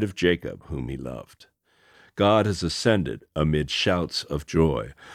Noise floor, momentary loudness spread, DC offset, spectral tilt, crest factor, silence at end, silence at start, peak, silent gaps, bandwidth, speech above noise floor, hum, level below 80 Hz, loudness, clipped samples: -59 dBFS; 13 LU; under 0.1%; -5.5 dB/octave; 20 dB; 0 s; 0 s; -6 dBFS; none; 14.5 kHz; 34 dB; none; -42 dBFS; -24 LUFS; under 0.1%